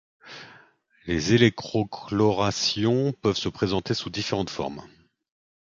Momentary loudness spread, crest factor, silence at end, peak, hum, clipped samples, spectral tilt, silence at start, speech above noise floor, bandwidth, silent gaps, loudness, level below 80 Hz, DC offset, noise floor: 22 LU; 22 dB; 0.8 s; -4 dBFS; none; under 0.1%; -5 dB/octave; 0.25 s; 34 dB; 7.6 kHz; none; -25 LUFS; -50 dBFS; under 0.1%; -58 dBFS